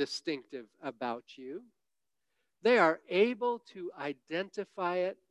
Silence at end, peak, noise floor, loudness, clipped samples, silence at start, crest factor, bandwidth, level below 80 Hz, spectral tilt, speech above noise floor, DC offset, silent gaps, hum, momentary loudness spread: 0.15 s; -12 dBFS; under -90 dBFS; -32 LUFS; under 0.1%; 0 s; 22 dB; 11 kHz; -86 dBFS; -4.5 dB/octave; over 57 dB; under 0.1%; none; none; 19 LU